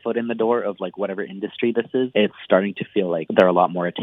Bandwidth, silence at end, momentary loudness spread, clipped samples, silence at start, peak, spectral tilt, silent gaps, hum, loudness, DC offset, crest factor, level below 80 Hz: 6 kHz; 0 s; 10 LU; under 0.1%; 0.05 s; 0 dBFS; -8 dB/octave; none; none; -21 LUFS; under 0.1%; 20 dB; -72 dBFS